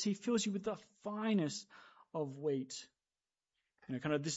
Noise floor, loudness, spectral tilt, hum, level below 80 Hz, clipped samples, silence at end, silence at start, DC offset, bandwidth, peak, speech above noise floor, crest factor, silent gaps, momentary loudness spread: under -90 dBFS; -39 LUFS; -5 dB/octave; none; -78 dBFS; under 0.1%; 0 s; 0 s; under 0.1%; 8 kHz; -24 dBFS; over 52 dB; 16 dB; none; 12 LU